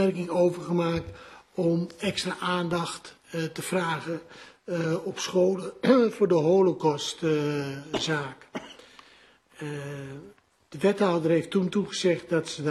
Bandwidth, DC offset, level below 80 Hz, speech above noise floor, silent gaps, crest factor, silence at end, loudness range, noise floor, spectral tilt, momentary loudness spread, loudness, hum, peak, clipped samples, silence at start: 13 kHz; under 0.1%; -62 dBFS; 31 dB; none; 20 dB; 0 s; 7 LU; -57 dBFS; -5.5 dB/octave; 18 LU; -27 LUFS; none; -8 dBFS; under 0.1%; 0 s